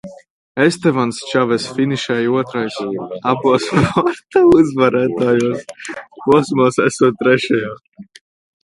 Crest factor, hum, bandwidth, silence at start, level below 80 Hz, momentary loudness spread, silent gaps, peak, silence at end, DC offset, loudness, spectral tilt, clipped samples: 16 dB; none; 11.5 kHz; 0.05 s; -48 dBFS; 11 LU; 0.30-0.55 s; 0 dBFS; 0.6 s; under 0.1%; -16 LUFS; -6 dB/octave; under 0.1%